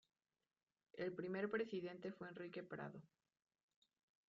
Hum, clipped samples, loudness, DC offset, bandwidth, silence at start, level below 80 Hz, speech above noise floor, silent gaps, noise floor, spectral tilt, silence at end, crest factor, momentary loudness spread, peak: none; under 0.1%; -48 LUFS; under 0.1%; 7.4 kHz; 0.95 s; -90 dBFS; over 42 dB; none; under -90 dBFS; -5 dB/octave; 1.2 s; 20 dB; 11 LU; -32 dBFS